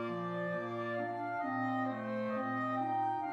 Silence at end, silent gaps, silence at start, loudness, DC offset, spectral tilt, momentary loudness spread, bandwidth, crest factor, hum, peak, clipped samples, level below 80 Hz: 0 s; none; 0 s; -36 LUFS; under 0.1%; -8 dB/octave; 3 LU; 8 kHz; 12 dB; none; -24 dBFS; under 0.1%; -84 dBFS